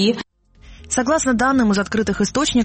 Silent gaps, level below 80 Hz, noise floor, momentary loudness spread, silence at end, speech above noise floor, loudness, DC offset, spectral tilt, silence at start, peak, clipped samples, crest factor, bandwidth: none; -42 dBFS; -45 dBFS; 8 LU; 0 s; 27 dB; -18 LUFS; under 0.1%; -4 dB/octave; 0 s; -4 dBFS; under 0.1%; 14 dB; 8.8 kHz